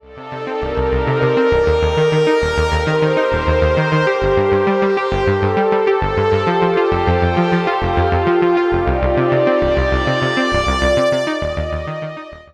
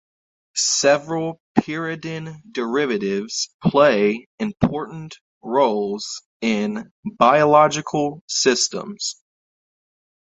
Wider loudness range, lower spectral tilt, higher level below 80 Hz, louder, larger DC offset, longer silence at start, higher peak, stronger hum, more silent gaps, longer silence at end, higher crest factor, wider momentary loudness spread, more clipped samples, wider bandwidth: about the same, 1 LU vs 3 LU; first, -6.5 dB/octave vs -3.5 dB/octave; first, -28 dBFS vs -54 dBFS; first, -16 LUFS vs -20 LUFS; neither; second, 0.05 s vs 0.55 s; about the same, -2 dBFS vs 0 dBFS; neither; second, none vs 1.40-1.55 s, 3.54-3.59 s, 4.26-4.38 s, 5.21-5.41 s, 6.26-6.40 s, 6.91-7.03 s, 8.21-8.28 s; second, 0.1 s vs 1.15 s; second, 14 dB vs 20 dB; second, 7 LU vs 15 LU; neither; first, 11 kHz vs 8.4 kHz